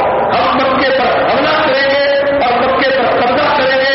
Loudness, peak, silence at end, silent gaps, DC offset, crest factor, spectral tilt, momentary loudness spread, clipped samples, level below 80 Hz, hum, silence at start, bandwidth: -11 LUFS; -4 dBFS; 0 s; none; under 0.1%; 8 dB; -1.5 dB/octave; 1 LU; under 0.1%; -42 dBFS; none; 0 s; 5.8 kHz